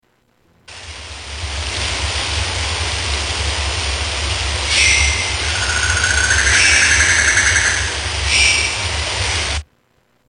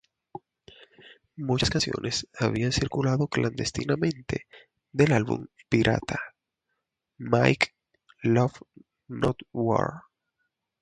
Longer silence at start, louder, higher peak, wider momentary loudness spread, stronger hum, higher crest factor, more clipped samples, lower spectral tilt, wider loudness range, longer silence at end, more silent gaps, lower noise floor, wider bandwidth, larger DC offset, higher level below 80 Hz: first, 0.7 s vs 0.35 s; first, -15 LUFS vs -27 LUFS; first, 0 dBFS vs -4 dBFS; second, 13 LU vs 19 LU; neither; about the same, 18 dB vs 22 dB; neither; second, -1 dB/octave vs -5.5 dB/octave; first, 8 LU vs 2 LU; second, 0.65 s vs 0.8 s; neither; second, -59 dBFS vs -81 dBFS; about the same, 10.5 kHz vs 10.5 kHz; neither; first, -26 dBFS vs -50 dBFS